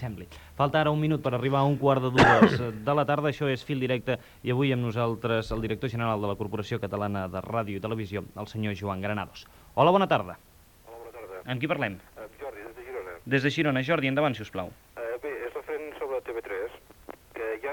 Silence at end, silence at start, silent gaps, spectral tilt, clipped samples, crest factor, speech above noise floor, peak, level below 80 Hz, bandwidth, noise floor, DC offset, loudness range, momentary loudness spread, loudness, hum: 0 s; 0 s; none; -7 dB/octave; under 0.1%; 22 dB; 24 dB; -6 dBFS; -52 dBFS; 19 kHz; -50 dBFS; under 0.1%; 9 LU; 18 LU; -27 LUFS; none